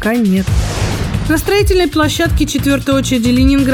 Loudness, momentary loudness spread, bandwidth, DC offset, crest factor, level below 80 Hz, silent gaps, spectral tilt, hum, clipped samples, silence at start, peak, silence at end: -13 LUFS; 6 LU; 19.5 kHz; under 0.1%; 12 dB; -22 dBFS; none; -5.5 dB/octave; none; under 0.1%; 0 s; 0 dBFS; 0 s